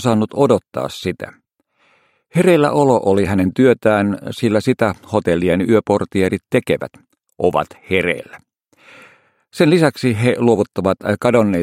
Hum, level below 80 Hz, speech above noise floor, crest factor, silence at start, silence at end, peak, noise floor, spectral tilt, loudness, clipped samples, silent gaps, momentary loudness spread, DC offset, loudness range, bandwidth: none; -50 dBFS; 45 dB; 16 dB; 0 s; 0 s; 0 dBFS; -61 dBFS; -6.5 dB/octave; -16 LUFS; under 0.1%; none; 10 LU; under 0.1%; 5 LU; 16 kHz